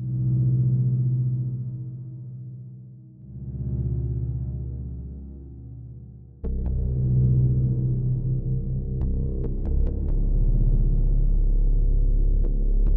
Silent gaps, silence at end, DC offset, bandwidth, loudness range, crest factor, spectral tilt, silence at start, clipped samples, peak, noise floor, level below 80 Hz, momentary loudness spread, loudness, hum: none; 0 s; under 0.1%; 1 kHz; 7 LU; 12 dB; -15.5 dB/octave; 0 s; under 0.1%; -10 dBFS; -44 dBFS; -24 dBFS; 19 LU; -26 LUFS; none